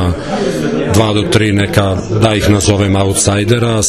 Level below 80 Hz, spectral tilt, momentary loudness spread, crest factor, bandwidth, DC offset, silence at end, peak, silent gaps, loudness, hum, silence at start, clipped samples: -30 dBFS; -5 dB/octave; 5 LU; 12 dB; 13.5 kHz; under 0.1%; 0 s; 0 dBFS; none; -12 LUFS; none; 0 s; 0.3%